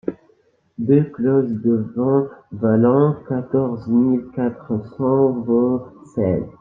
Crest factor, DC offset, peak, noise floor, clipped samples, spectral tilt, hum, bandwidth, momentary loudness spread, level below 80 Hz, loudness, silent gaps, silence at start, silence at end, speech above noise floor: 16 dB; under 0.1%; -4 dBFS; -59 dBFS; under 0.1%; -12 dB/octave; none; 3.6 kHz; 10 LU; -56 dBFS; -19 LUFS; none; 0.05 s; 0.1 s; 40 dB